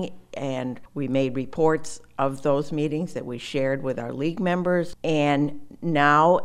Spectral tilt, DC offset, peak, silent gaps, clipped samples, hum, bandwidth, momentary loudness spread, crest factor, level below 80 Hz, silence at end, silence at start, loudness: -6.5 dB/octave; under 0.1%; -6 dBFS; none; under 0.1%; none; 12.5 kHz; 11 LU; 18 dB; -54 dBFS; 0 s; 0 s; -25 LUFS